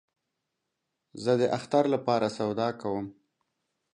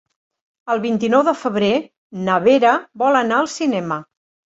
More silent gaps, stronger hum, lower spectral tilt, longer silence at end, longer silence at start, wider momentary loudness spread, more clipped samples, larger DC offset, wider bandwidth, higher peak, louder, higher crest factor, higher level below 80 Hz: second, none vs 1.97-2.10 s; neither; first, -6.5 dB/octave vs -5 dB/octave; first, 0.85 s vs 0.45 s; first, 1.15 s vs 0.65 s; second, 8 LU vs 12 LU; neither; neither; first, 11 kHz vs 8 kHz; second, -10 dBFS vs -2 dBFS; second, -28 LUFS vs -18 LUFS; about the same, 20 dB vs 16 dB; second, -70 dBFS vs -62 dBFS